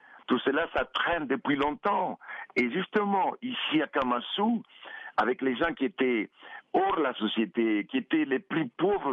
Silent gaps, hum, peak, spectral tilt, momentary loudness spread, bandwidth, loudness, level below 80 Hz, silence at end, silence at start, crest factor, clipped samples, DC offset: none; none; -14 dBFS; -7 dB/octave; 5 LU; 7.2 kHz; -29 LUFS; -60 dBFS; 0 s; 0.1 s; 14 dB; under 0.1%; under 0.1%